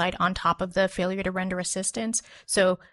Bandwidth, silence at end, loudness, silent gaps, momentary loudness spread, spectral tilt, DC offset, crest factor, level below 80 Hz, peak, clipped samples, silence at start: 11.5 kHz; 0.15 s; -26 LUFS; none; 5 LU; -3.5 dB/octave; under 0.1%; 16 dB; -50 dBFS; -10 dBFS; under 0.1%; 0 s